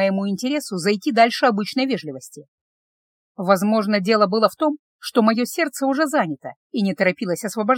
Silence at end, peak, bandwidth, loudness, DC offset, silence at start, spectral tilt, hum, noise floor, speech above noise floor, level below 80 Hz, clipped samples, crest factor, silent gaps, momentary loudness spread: 0 s; -2 dBFS; 17 kHz; -20 LUFS; under 0.1%; 0 s; -5 dB/octave; none; under -90 dBFS; over 70 dB; -76 dBFS; under 0.1%; 20 dB; 2.48-3.35 s, 4.79-4.99 s, 6.56-6.70 s; 11 LU